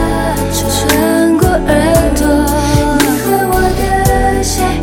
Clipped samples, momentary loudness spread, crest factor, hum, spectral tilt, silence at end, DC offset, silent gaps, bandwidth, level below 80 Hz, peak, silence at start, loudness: under 0.1%; 4 LU; 10 dB; none; -5 dB/octave; 0 s; under 0.1%; none; 17 kHz; -20 dBFS; 0 dBFS; 0 s; -12 LUFS